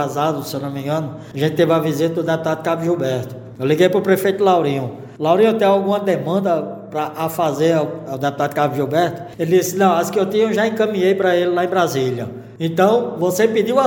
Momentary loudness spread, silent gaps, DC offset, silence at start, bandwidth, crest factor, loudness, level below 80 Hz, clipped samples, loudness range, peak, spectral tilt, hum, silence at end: 10 LU; none; under 0.1%; 0 s; 17 kHz; 18 dB; -18 LUFS; -62 dBFS; under 0.1%; 3 LU; 0 dBFS; -6 dB/octave; none; 0 s